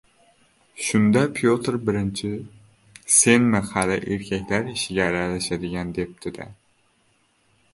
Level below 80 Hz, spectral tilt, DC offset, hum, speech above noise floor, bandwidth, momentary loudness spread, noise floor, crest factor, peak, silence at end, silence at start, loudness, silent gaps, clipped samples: -50 dBFS; -4 dB/octave; under 0.1%; none; 42 dB; 11.5 kHz; 16 LU; -64 dBFS; 22 dB; -2 dBFS; 1.2 s; 0.75 s; -22 LUFS; none; under 0.1%